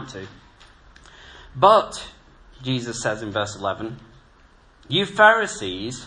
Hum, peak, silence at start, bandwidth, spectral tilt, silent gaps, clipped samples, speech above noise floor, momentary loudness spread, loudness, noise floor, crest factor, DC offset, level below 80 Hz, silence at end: none; -2 dBFS; 0 s; 10.5 kHz; -4 dB/octave; none; under 0.1%; 32 dB; 23 LU; -20 LUFS; -53 dBFS; 22 dB; under 0.1%; -52 dBFS; 0 s